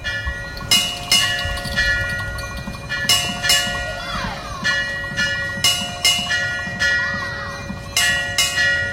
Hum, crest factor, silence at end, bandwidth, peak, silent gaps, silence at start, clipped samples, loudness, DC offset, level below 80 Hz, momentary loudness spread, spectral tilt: none; 18 dB; 0 s; 16.5 kHz; -2 dBFS; none; 0 s; under 0.1%; -18 LUFS; under 0.1%; -36 dBFS; 11 LU; -1 dB/octave